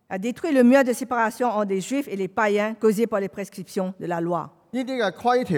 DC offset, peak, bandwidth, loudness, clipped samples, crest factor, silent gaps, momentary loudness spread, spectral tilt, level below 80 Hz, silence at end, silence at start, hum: under 0.1%; -4 dBFS; 17 kHz; -23 LUFS; under 0.1%; 18 dB; none; 11 LU; -5.5 dB/octave; -70 dBFS; 0 s; 0.1 s; none